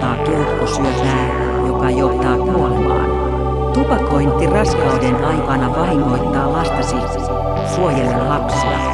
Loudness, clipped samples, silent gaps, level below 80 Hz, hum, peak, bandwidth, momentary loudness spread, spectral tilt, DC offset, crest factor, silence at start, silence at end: -16 LUFS; under 0.1%; none; -24 dBFS; none; -2 dBFS; 11 kHz; 4 LU; -6.5 dB/octave; under 0.1%; 14 dB; 0 s; 0 s